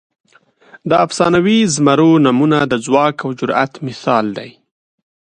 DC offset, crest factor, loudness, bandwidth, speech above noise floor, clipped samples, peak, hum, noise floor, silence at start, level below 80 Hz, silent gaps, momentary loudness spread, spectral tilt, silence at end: under 0.1%; 14 dB; -14 LUFS; 10 kHz; 36 dB; under 0.1%; 0 dBFS; none; -49 dBFS; 0.85 s; -54 dBFS; none; 11 LU; -5.5 dB/octave; 0.8 s